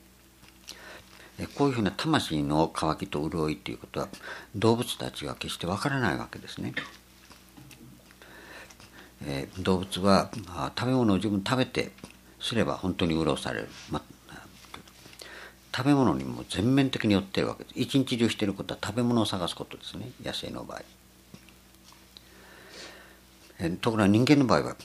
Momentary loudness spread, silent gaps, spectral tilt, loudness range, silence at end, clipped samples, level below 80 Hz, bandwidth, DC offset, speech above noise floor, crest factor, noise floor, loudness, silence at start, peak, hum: 22 LU; none; -5.5 dB/octave; 11 LU; 0 s; under 0.1%; -54 dBFS; 15.5 kHz; under 0.1%; 28 dB; 24 dB; -55 dBFS; -28 LUFS; 0.65 s; -6 dBFS; 60 Hz at -55 dBFS